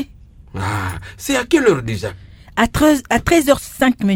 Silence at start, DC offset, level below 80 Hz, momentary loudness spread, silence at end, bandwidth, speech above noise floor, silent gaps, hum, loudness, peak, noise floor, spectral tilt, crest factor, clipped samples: 0 s; under 0.1%; -36 dBFS; 13 LU; 0 s; 17 kHz; 26 dB; none; none; -17 LUFS; 0 dBFS; -42 dBFS; -5 dB/octave; 18 dB; under 0.1%